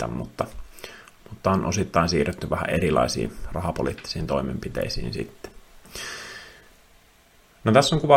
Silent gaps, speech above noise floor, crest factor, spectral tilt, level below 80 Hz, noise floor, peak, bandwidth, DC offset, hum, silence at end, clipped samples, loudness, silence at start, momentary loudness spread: none; 32 dB; 24 dB; -5 dB/octave; -42 dBFS; -56 dBFS; -2 dBFS; 16.5 kHz; under 0.1%; none; 0 s; under 0.1%; -25 LUFS; 0 s; 21 LU